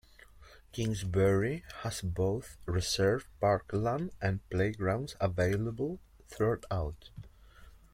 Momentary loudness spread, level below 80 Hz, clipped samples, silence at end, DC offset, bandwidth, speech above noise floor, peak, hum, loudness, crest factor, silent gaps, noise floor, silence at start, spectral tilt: 10 LU; -52 dBFS; under 0.1%; 0.15 s; under 0.1%; 15.5 kHz; 24 dB; -16 dBFS; none; -33 LUFS; 18 dB; none; -56 dBFS; 0.35 s; -6 dB/octave